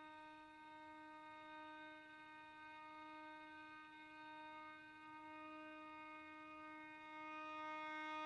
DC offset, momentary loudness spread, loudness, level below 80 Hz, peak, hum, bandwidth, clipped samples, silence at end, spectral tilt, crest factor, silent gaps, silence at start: under 0.1%; 9 LU; -55 LUFS; -88 dBFS; -40 dBFS; none; 11 kHz; under 0.1%; 0 s; -4 dB/octave; 16 dB; none; 0 s